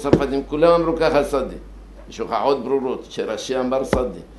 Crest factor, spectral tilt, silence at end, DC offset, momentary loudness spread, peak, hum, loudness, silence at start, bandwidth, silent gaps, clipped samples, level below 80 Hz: 20 dB; -6 dB/octave; 0 s; under 0.1%; 12 LU; 0 dBFS; none; -20 LUFS; 0 s; 12 kHz; none; under 0.1%; -38 dBFS